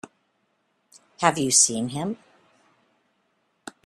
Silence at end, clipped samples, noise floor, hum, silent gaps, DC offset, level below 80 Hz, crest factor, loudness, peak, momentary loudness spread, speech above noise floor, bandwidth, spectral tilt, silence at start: 1.7 s; under 0.1%; -71 dBFS; none; none; under 0.1%; -68 dBFS; 26 dB; -21 LUFS; -2 dBFS; 25 LU; 49 dB; 14 kHz; -2.5 dB/octave; 1.2 s